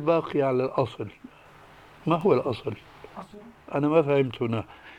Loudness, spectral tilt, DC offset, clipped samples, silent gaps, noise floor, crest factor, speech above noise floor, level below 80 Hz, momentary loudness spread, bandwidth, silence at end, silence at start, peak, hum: -26 LUFS; -8.5 dB/octave; under 0.1%; under 0.1%; none; -51 dBFS; 18 dB; 26 dB; -62 dBFS; 21 LU; 10.5 kHz; 0 s; 0 s; -8 dBFS; none